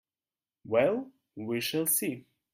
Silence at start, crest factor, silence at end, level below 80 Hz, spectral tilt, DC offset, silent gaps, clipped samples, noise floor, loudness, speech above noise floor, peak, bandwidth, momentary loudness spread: 0.65 s; 20 dB; 0.35 s; -74 dBFS; -3.5 dB/octave; under 0.1%; none; under 0.1%; under -90 dBFS; -29 LUFS; over 61 dB; -12 dBFS; 16 kHz; 16 LU